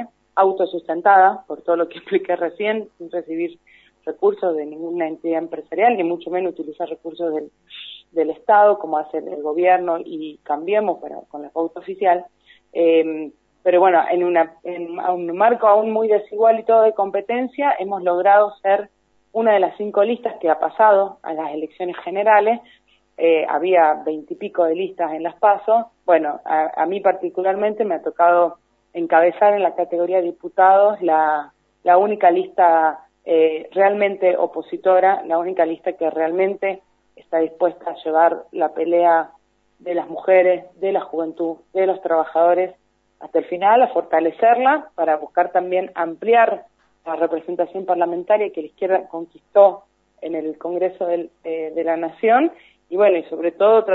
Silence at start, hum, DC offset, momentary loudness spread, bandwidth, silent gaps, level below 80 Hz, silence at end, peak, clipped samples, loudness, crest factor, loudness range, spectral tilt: 0 s; none; under 0.1%; 13 LU; 4.2 kHz; none; -72 dBFS; 0 s; 0 dBFS; under 0.1%; -19 LUFS; 18 dB; 5 LU; -8 dB/octave